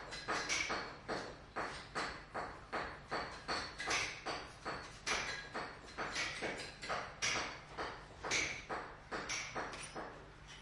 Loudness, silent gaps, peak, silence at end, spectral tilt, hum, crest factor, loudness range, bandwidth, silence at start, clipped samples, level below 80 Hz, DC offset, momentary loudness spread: -41 LUFS; none; -22 dBFS; 0 s; -2 dB/octave; none; 20 dB; 2 LU; 11.5 kHz; 0 s; under 0.1%; -62 dBFS; under 0.1%; 9 LU